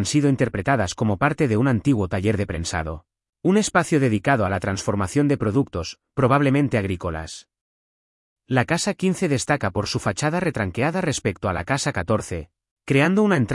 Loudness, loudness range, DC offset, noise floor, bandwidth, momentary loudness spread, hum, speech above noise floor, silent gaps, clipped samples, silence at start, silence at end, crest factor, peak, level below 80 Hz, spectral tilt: -22 LUFS; 3 LU; under 0.1%; under -90 dBFS; 12 kHz; 9 LU; none; over 69 dB; 3.29-3.33 s, 7.61-8.36 s, 12.71-12.77 s; under 0.1%; 0 s; 0 s; 18 dB; -4 dBFS; -48 dBFS; -5.5 dB/octave